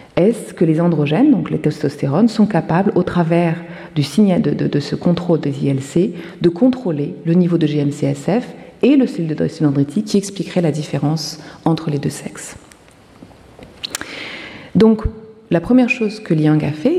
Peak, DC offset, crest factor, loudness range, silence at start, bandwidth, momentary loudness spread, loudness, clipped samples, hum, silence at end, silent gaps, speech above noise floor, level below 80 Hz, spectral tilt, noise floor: -2 dBFS; under 0.1%; 14 dB; 6 LU; 0.15 s; 14 kHz; 12 LU; -17 LUFS; under 0.1%; none; 0 s; none; 29 dB; -42 dBFS; -7 dB/octave; -45 dBFS